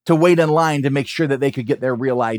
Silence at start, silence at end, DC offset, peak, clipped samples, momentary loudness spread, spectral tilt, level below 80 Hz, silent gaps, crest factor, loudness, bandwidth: 0.05 s; 0 s; under 0.1%; -2 dBFS; under 0.1%; 7 LU; -6.5 dB/octave; -68 dBFS; none; 16 dB; -17 LUFS; 18 kHz